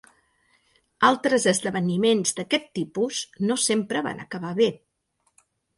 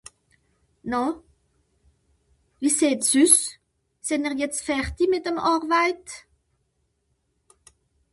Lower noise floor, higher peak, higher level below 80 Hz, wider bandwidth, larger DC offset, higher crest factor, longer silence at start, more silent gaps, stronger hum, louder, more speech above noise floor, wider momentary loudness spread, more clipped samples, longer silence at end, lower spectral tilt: about the same, -72 dBFS vs -72 dBFS; about the same, -4 dBFS vs -4 dBFS; second, -66 dBFS vs -52 dBFS; about the same, 11.5 kHz vs 12 kHz; neither; about the same, 22 dB vs 22 dB; first, 1 s vs 0.85 s; neither; neither; about the same, -24 LUFS vs -22 LUFS; about the same, 48 dB vs 50 dB; second, 8 LU vs 18 LU; neither; second, 1 s vs 1.95 s; first, -3.5 dB/octave vs -2 dB/octave